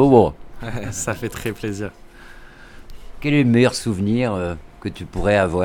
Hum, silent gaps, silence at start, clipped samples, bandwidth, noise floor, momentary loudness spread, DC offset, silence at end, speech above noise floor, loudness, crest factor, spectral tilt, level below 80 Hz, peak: none; none; 0 s; under 0.1%; 18 kHz; -41 dBFS; 16 LU; under 0.1%; 0 s; 22 dB; -20 LUFS; 20 dB; -6 dB/octave; -38 dBFS; 0 dBFS